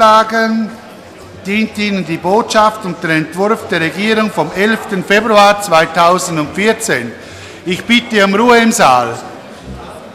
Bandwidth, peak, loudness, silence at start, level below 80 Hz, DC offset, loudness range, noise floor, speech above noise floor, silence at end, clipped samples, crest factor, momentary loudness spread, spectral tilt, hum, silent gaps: 16 kHz; 0 dBFS; -12 LUFS; 0 s; -46 dBFS; under 0.1%; 3 LU; -33 dBFS; 22 dB; 0 s; under 0.1%; 12 dB; 19 LU; -4 dB/octave; none; none